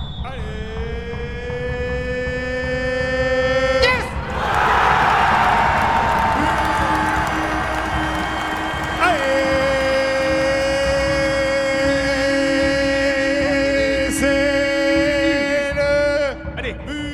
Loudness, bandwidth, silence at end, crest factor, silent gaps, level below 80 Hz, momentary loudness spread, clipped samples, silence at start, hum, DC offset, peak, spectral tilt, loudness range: -18 LUFS; 15 kHz; 0 s; 16 dB; none; -32 dBFS; 11 LU; under 0.1%; 0 s; none; under 0.1%; -2 dBFS; -4.5 dB/octave; 4 LU